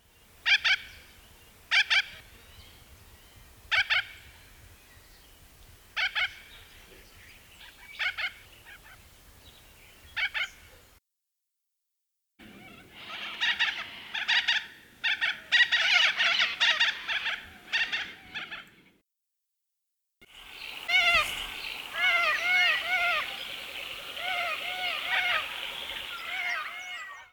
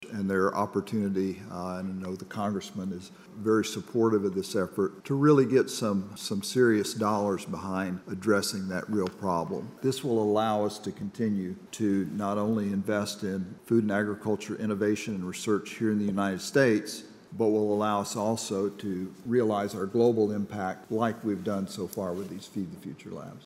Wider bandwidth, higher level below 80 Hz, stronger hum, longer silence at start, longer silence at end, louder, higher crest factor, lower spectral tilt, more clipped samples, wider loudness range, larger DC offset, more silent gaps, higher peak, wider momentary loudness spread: first, over 20 kHz vs 16 kHz; first, -62 dBFS vs -72 dBFS; neither; first, 0.45 s vs 0 s; about the same, 0.1 s vs 0.05 s; about the same, -27 LUFS vs -29 LUFS; about the same, 22 dB vs 18 dB; second, 0.5 dB/octave vs -5.5 dB/octave; neither; first, 14 LU vs 4 LU; neither; neither; about the same, -10 dBFS vs -10 dBFS; first, 17 LU vs 11 LU